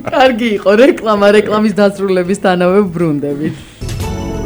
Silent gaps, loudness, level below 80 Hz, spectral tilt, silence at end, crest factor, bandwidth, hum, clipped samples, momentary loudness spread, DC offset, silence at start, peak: none; -12 LUFS; -34 dBFS; -6 dB/octave; 0 s; 12 dB; over 20 kHz; none; 0.1%; 12 LU; under 0.1%; 0 s; 0 dBFS